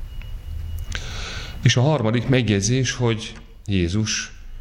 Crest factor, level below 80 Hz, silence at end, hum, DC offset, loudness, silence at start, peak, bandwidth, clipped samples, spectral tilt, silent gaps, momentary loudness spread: 18 dB; -34 dBFS; 0 s; none; under 0.1%; -22 LUFS; 0 s; -4 dBFS; 14 kHz; under 0.1%; -5 dB/octave; none; 16 LU